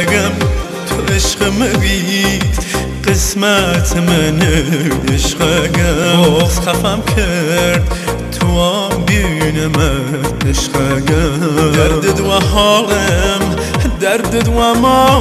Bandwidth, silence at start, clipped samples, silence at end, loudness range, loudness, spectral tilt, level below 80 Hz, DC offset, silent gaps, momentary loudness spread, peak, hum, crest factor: 15 kHz; 0 s; under 0.1%; 0 s; 2 LU; -13 LUFS; -4.5 dB/octave; -22 dBFS; under 0.1%; none; 6 LU; 0 dBFS; none; 12 dB